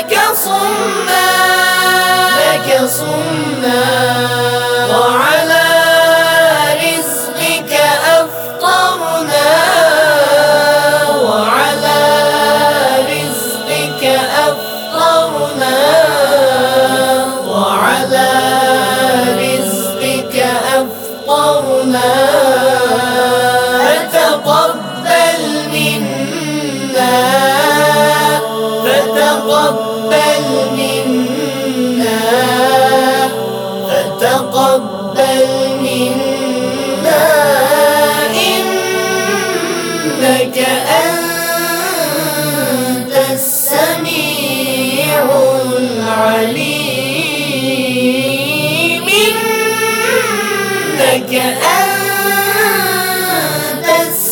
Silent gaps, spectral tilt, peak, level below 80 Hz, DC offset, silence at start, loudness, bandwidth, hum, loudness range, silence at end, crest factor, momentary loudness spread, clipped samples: none; -3 dB/octave; 0 dBFS; -60 dBFS; under 0.1%; 0 s; -11 LUFS; over 20 kHz; none; 3 LU; 0 s; 12 dB; 6 LU; under 0.1%